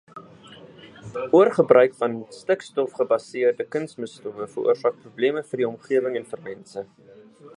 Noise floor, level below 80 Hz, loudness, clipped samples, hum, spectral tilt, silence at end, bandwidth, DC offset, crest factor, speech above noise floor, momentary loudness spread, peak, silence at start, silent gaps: -46 dBFS; -72 dBFS; -23 LUFS; under 0.1%; none; -6 dB/octave; 0.1 s; 10.5 kHz; under 0.1%; 22 dB; 24 dB; 19 LU; -2 dBFS; 0.15 s; none